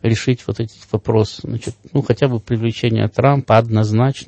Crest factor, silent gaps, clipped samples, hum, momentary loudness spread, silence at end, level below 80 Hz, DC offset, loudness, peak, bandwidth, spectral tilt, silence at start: 16 dB; none; under 0.1%; none; 11 LU; 0.05 s; -46 dBFS; under 0.1%; -18 LUFS; 0 dBFS; 8.6 kHz; -7 dB/octave; 0 s